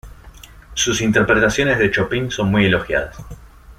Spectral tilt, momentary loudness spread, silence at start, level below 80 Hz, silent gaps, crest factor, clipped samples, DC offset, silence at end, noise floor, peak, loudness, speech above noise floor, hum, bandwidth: -4.5 dB/octave; 9 LU; 0.05 s; -38 dBFS; none; 16 dB; under 0.1%; under 0.1%; 0.05 s; -41 dBFS; -2 dBFS; -17 LUFS; 24 dB; none; 15.5 kHz